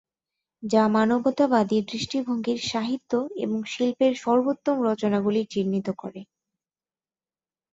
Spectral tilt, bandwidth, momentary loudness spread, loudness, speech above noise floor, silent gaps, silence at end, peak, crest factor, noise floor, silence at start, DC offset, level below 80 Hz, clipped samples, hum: -5.5 dB/octave; 7.8 kHz; 8 LU; -24 LUFS; over 66 dB; none; 1.5 s; -8 dBFS; 18 dB; under -90 dBFS; 0.6 s; under 0.1%; -66 dBFS; under 0.1%; none